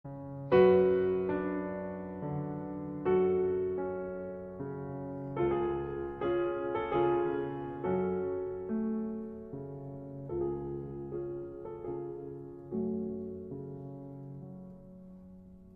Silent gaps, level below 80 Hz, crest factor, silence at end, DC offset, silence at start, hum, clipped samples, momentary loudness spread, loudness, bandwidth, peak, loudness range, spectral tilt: none; -58 dBFS; 20 dB; 0.05 s; under 0.1%; 0.05 s; none; under 0.1%; 17 LU; -34 LUFS; 4.3 kHz; -12 dBFS; 10 LU; -10.5 dB/octave